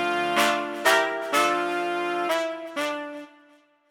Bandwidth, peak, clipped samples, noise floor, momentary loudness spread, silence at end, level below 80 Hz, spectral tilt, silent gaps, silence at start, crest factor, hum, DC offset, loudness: over 20 kHz; -6 dBFS; under 0.1%; -58 dBFS; 9 LU; 0.65 s; -72 dBFS; -2 dB/octave; none; 0 s; 20 dB; none; under 0.1%; -24 LUFS